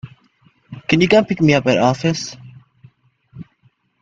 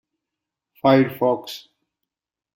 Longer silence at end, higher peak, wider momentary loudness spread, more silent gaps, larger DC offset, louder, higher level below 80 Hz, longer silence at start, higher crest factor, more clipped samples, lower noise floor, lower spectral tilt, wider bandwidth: second, 0.6 s vs 0.95 s; first, 0 dBFS vs -4 dBFS; about the same, 18 LU vs 19 LU; neither; neither; first, -15 LUFS vs -19 LUFS; first, -52 dBFS vs -64 dBFS; second, 0.05 s vs 0.85 s; about the same, 18 dB vs 20 dB; neither; second, -59 dBFS vs -85 dBFS; about the same, -6 dB/octave vs -7 dB/octave; second, 7.8 kHz vs 16.5 kHz